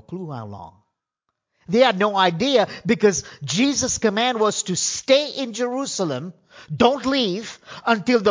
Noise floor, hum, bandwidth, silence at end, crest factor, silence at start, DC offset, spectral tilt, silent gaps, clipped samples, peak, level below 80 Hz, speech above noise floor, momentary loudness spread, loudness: -79 dBFS; none; 7.8 kHz; 0 s; 20 dB; 0.1 s; under 0.1%; -3.5 dB/octave; none; under 0.1%; -2 dBFS; -54 dBFS; 59 dB; 15 LU; -20 LUFS